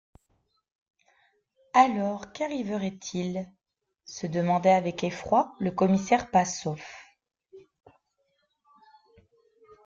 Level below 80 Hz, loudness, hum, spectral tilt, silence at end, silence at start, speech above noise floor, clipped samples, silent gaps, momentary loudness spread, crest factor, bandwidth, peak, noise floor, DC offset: -64 dBFS; -27 LUFS; none; -5.5 dB/octave; 2.25 s; 1.75 s; 48 dB; under 0.1%; none; 15 LU; 22 dB; 7.6 kHz; -6 dBFS; -74 dBFS; under 0.1%